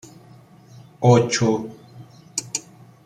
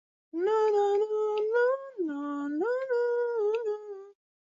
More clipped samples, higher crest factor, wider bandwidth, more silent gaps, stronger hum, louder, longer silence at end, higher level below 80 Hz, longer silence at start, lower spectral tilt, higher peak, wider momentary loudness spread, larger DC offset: neither; first, 20 dB vs 12 dB; first, 13.5 kHz vs 7.6 kHz; neither; neither; first, -21 LUFS vs -29 LUFS; about the same, 0.45 s vs 0.4 s; first, -60 dBFS vs -84 dBFS; first, 1 s vs 0.35 s; about the same, -5 dB/octave vs -4 dB/octave; first, -2 dBFS vs -16 dBFS; first, 14 LU vs 10 LU; neither